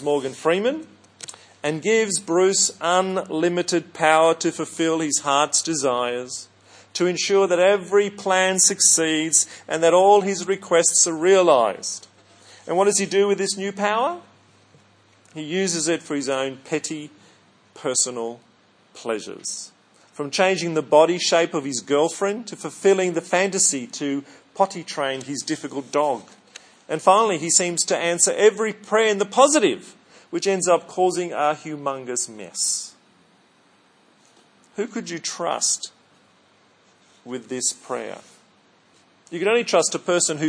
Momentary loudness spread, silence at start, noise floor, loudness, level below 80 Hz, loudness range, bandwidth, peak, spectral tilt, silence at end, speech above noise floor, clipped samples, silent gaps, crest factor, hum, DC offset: 15 LU; 0 s; -58 dBFS; -20 LUFS; -78 dBFS; 11 LU; 10.5 kHz; 0 dBFS; -2.5 dB/octave; 0 s; 37 dB; under 0.1%; none; 22 dB; none; under 0.1%